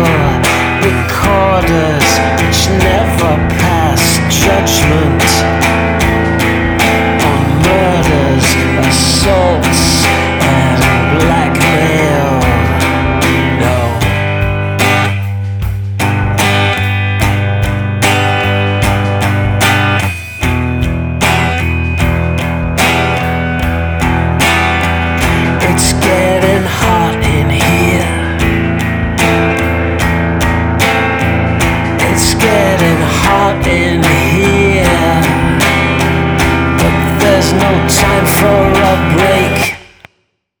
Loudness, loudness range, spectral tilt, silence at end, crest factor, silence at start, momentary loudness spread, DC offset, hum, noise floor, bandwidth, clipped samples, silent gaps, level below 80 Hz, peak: -10 LUFS; 3 LU; -5 dB/octave; 0.75 s; 10 dB; 0 s; 5 LU; under 0.1%; none; -61 dBFS; over 20 kHz; under 0.1%; none; -22 dBFS; 0 dBFS